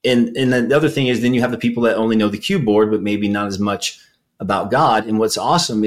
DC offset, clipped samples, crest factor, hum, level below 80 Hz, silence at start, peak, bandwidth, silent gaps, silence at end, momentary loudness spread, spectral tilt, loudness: 0.3%; under 0.1%; 14 dB; none; -54 dBFS; 0.05 s; -4 dBFS; 15.5 kHz; none; 0 s; 5 LU; -5 dB/octave; -17 LUFS